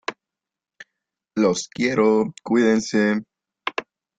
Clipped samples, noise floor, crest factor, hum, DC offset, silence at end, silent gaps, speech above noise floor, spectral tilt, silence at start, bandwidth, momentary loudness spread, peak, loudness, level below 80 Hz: under 0.1%; -88 dBFS; 18 dB; none; under 0.1%; 0.4 s; none; 68 dB; -5 dB/octave; 0.1 s; 9.2 kHz; 13 LU; -6 dBFS; -21 LUFS; -64 dBFS